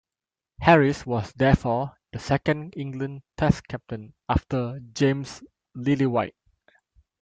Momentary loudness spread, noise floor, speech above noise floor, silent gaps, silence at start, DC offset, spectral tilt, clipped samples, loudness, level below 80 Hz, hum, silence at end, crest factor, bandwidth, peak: 16 LU; under -90 dBFS; over 66 dB; none; 0.6 s; under 0.1%; -7 dB/octave; under 0.1%; -25 LUFS; -44 dBFS; none; 0.9 s; 22 dB; 8.8 kHz; -2 dBFS